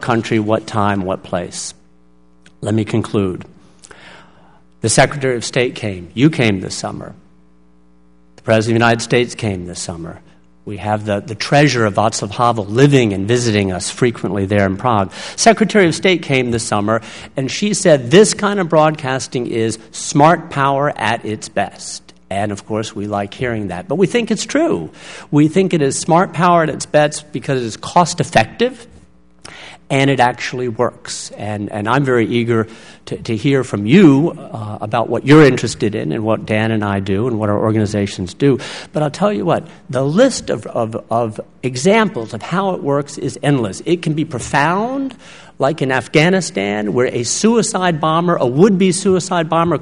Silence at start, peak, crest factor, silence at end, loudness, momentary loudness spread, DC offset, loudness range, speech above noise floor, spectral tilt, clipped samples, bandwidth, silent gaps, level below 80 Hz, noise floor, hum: 0 s; 0 dBFS; 16 dB; 0 s; -16 LUFS; 12 LU; 0.4%; 5 LU; 37 dB; -5 dB/octave; under 0.1%; 11 kHz; none; -48 dBFS; -52 dBFS; none